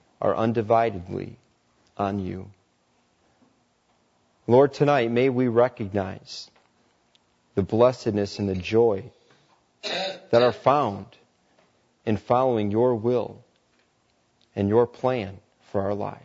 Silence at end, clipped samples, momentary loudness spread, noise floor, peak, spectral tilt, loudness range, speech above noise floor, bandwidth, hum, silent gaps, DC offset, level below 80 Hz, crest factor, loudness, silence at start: 0.1 s; under 0.1%; 16 LU; -67 dBFS; -6 dBFS; -7 dB/octave; 5 LU; 44 dB; 8 kHz; none; none; under 0.1%; -62 dBFS; 20 dB; -24 LUFS; 0.2 s